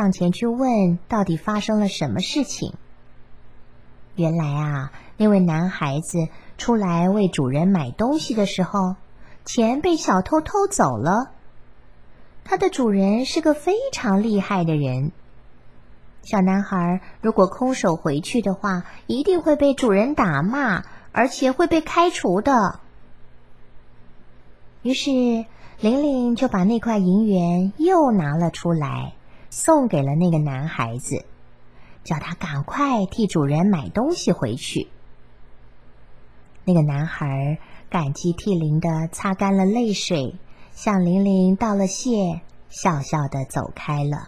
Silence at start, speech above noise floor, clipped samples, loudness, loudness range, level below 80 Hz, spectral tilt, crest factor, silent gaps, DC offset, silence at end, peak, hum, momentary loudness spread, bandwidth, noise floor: 0 s; 27 dB; under 0.1%; -21 LUFS; 5 LU; -48 dBFS; -6 dB/octave; 18 dB; none; 0.7%; 0 s; -2 dBFS; none; 9 LU; 12.5 kHz; -47 dBFS